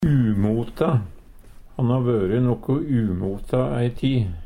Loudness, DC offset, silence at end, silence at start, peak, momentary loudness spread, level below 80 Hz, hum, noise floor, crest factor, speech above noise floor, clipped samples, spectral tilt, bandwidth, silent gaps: -22 LUFS; under 0.1%; 0 s; 0 s; -8 dBFS; 5 LU; -38 dBFS; none; -43 dBFS; 14 dB; 22 dB; under 0.1%; -9.5 dB/octave; 10.5 kHz; none